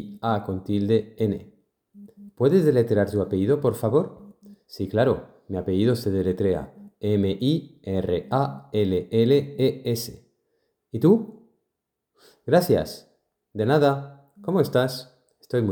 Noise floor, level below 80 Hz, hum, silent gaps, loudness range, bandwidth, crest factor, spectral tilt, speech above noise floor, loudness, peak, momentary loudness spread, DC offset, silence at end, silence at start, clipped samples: -81 dBFS; -56 dBFS; none; none; 2 LU; 19.5 kHz; 18 dB; -7.5 dB/octave; 59 dB; -23 LUFS; -6 dBFS; 14 LU; under 0.1%; 0 s; 0 s; under 0.1%